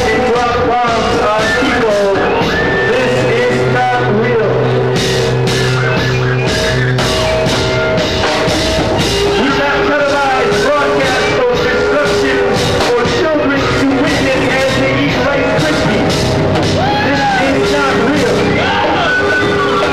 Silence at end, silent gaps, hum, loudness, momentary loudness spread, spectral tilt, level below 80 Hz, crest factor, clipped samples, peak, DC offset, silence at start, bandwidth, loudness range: 0 s; none; none; -12 LUFS; 1 LU; -5 dB/octave; -30 dBFS; 8 dB; under 0.1%; -2 dBFS; 1%; 0 s; 15.5 kHz; 1 LU